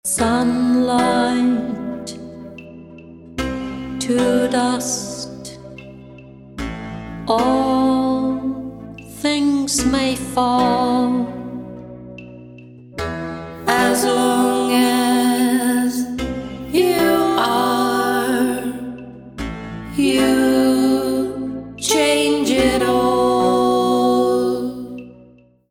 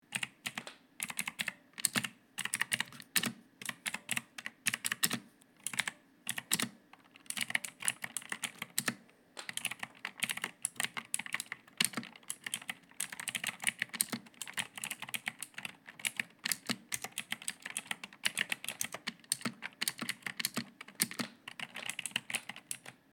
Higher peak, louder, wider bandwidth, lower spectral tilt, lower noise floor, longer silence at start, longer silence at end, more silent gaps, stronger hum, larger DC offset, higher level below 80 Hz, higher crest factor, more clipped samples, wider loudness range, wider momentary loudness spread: first, -4 dBFS vs -8 dBFS; first, -18 LUFS vs -37 LUFS; about the same, 16.5 kHz vs 17 kHz; first, -4 dB/octave vs -0.5 dB/octave; second, -49 dBFS vs -61 dBFS; about the same, 0.05 s vs 0.1 s; first, 0.5 s vs 0.2 s; neither; neither; neither; first, -44 dBFS vs -84 dBFS; second, 16 dB vs 32 dB; neither; first, 6 LU vs 2 LU; first, 19 LU vs 10 LU